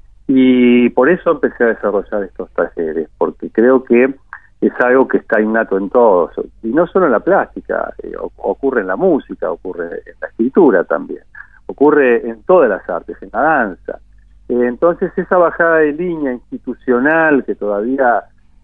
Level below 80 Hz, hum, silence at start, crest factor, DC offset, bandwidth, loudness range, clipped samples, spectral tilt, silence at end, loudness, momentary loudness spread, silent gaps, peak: -46 dBFS; none; 0.3 s; 14 dB; 0.4%; 3.9 kHz; 3 LU; under 0.1%; -9.5 dB/octave; 0.45 s; -14 LUFS; 13 LU; none; 0 dBFS